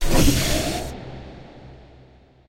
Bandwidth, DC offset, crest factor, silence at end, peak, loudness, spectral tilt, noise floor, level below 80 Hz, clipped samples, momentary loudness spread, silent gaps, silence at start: 16 kHz; under 0.1%; 18 dB; 0.75 s; -4 dBFS; -22 LUFS; -4 dB/octave; -51 dBFS; -26 dBFS; under 0.1%; 25 LU; none; 0 s